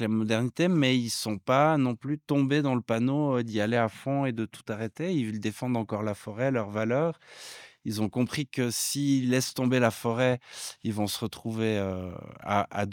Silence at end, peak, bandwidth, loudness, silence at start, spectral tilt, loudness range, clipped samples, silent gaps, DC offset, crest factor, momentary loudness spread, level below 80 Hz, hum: 0 s; -8 dBFS; 18 kHz; -28 LUFS; 0 s; -5.5 dB/octave; 5 LU; under 0.1%; none; under 0.1%; 20 dB; 11 LU; -70 dBFS; none